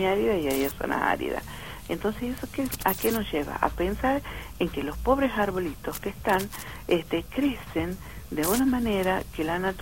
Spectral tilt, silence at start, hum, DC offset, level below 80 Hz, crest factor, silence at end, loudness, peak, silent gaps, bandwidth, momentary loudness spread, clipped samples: -5 dB/octave; 0 s; none; 0.3%; -42 dBFS; 22 dB; 0 s; -28 LUFS; -6 dBFS; none; 17 kHz; 10 LU; under 0.1%